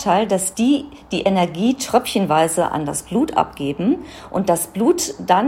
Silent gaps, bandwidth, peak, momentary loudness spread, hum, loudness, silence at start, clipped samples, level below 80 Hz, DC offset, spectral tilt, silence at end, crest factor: none; 17 kHz; 0 dBFS; 6 LU; none; -19 LUFS; 0 s; under 0.1%; -50 dBFS; under 0.1%; -4.5 dB/octave; 0 s; 18 dB